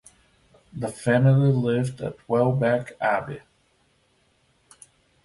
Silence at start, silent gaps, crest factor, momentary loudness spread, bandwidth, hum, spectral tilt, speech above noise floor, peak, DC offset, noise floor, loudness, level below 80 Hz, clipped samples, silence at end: 0.75 s; none; 18 dB; 16 LU; 11.5 kHz; none; -8 dB/octave; 43 dB; -8 dBFS; under 0.1%; -65 dBFS; -23 LUFS; -58 dBFS; under 0.1%; 1.85 s